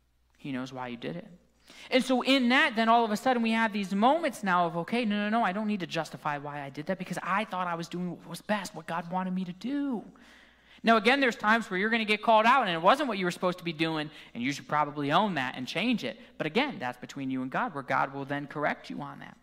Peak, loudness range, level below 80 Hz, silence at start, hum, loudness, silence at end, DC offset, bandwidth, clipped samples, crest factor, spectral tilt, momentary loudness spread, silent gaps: -8 dBFS; 8 LU; -70 dBFS; 0.45 s; none; -28 LUFS; 0.1 s; under 0.1%; 16 kHz; under 0.1%; 20 dB; -5 dB/octave; 14 LU; none